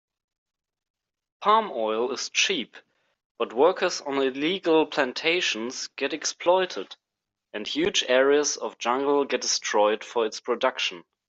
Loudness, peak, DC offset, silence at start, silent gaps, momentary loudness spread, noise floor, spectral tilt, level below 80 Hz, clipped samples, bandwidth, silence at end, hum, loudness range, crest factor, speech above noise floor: -24 LUFS; -8 dBFS; under 0.1%; 1.4 s; 3.25-3.35 s; 9 LU; -85 dBFS; -2 dB/octave; -70 dBFS; under 0.1%; 8.2 kHz; 0.25 s; none; 3 LU; 18 dB; 61 dB